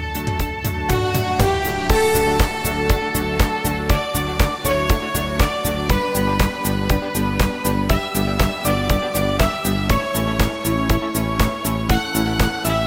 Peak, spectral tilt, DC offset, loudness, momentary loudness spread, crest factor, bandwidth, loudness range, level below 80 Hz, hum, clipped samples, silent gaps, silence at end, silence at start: -2 dBFS; -5 dB/octave; under 0.1%; -20 LUFS; 3 LU; 18 dB; 17 kHz; 1 LU; -26 dBFS; none; under 0.1%; none; 0 s; 0 s